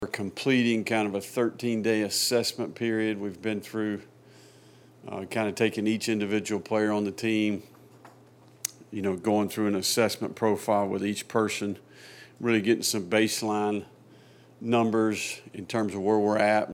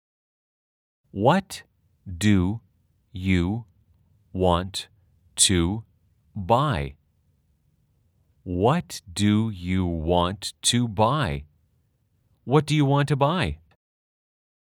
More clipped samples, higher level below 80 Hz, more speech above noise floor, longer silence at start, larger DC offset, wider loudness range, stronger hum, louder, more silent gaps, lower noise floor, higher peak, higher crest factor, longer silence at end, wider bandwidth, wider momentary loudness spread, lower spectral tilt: neither; second, -74 dBFS vs -48 dBFS; second, 28 dB vs 45 dB; second, 0 s vs 1.15 s; neither; about the same, 3 LU vs 3 LU; neither; second, -27 LUFS vs -23 LUFS; neither; second, -55 dBFS vs -68 dBFS; second, -10 dBFS vs -4 dBFS; about the same, 18 dB vs 22 dB; second, 0 s vs 1.15 s; about the same, 17.5 kHz vs 17.5 kHz; second, 11 LU vs 17 LU; about the same, -4 dB/octave vs -5 dB/octave